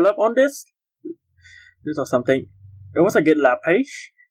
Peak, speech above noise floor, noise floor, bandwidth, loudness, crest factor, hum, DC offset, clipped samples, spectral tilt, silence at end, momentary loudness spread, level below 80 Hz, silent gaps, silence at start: -4 dBFS; 31 dB; -50 dBFS; 16.5 kHz; -19 LUFS; 16 dB; none; under 0.1%; under 0.1%; -5.5 dB/octave; 0.25 s; 21 LU; -68 dBFS; none; 0 s